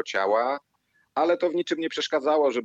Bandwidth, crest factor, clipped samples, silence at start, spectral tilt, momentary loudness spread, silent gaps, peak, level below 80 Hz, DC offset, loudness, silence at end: 8.2 kHz; 14 dB; under 0.1%; 0 s; -3.5 dB/octave; 6 LU; none; -10 dBFS; -78 dBFS; under 0.1%; -25 LUFS; 0 s